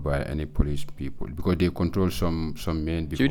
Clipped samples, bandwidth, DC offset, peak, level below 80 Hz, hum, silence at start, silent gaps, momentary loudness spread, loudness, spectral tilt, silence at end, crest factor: under 0.1%; 18.5 kHz; under 0.1%; -8 dBFS; -34 dBFS; none; 0 s; none; 9 LU; -28 LUFS; -7 dB/octave; 0 s; 16 dB